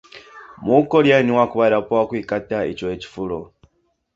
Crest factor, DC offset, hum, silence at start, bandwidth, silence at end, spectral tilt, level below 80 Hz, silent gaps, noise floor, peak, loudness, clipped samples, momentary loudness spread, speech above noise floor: 18 dB; under 0.1%; none; 0.15 s; 7.6 kHz; 0.7 s; -7 dB/octave; -52 dBFS; none; -65 dBFS; -2 dBFS; -19 LUFS; under 0.1%; 14 LU; 47 dB